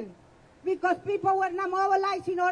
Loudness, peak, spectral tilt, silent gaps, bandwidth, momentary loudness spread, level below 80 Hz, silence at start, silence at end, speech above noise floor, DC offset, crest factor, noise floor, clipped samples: -27 LUFS; -14 dBFS; -5 dB/octave; none; 10 kHz; 8 LU; -68 dBFS; 0 s; 0 s; 30 dB; under 0.1%; 14 dB; -56 dBFS; under 0.1%